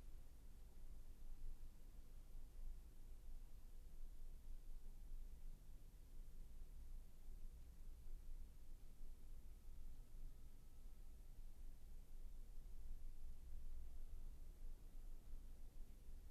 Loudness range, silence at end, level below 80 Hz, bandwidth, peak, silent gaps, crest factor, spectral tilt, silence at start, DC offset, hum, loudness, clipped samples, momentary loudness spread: 2 LU; 0 s; -54 dBFS; 13.5 kHz; -42 dBFS; none; 12 dB; -5.5 dB/octave; 0 s; under 0.1%; none; -64 LUFS; under 0.1%; 5 LU